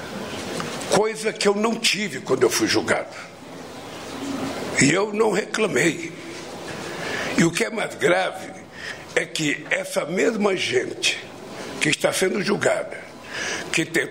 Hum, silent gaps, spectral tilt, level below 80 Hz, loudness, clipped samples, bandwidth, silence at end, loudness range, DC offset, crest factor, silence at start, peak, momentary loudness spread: none; none; -3.5 dB/octave; -60 dBFS; -22 LUFS; under 0.1%; 16 kHz; 0 s; 2 LU; 0.1%; 20 dB; 0 s; -4 dBFS; 15 LU